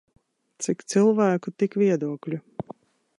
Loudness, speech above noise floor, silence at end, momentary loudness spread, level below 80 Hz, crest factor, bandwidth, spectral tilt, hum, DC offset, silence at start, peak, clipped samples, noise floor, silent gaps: -24 LUFS; 24 dB; 0.45 s; 17 LU; -72 dBFS; 18 dB; 11.5 kHz; -6 dB/octave; none; under 0.1%; 0.6 s; -8 dBFS; under 0.1%; -47 dBFS; none